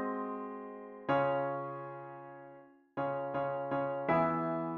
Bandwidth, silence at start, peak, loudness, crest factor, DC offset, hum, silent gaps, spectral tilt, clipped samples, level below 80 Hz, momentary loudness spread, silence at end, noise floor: 5.6 kHz; 0 s; -18 dBFS; -35 LUFS; 16 dB; under 0.1%; none; none; -9.5 dB/octave; under 0.1%; -72 dBFS; 17 LU; 0 s; -57 dBFS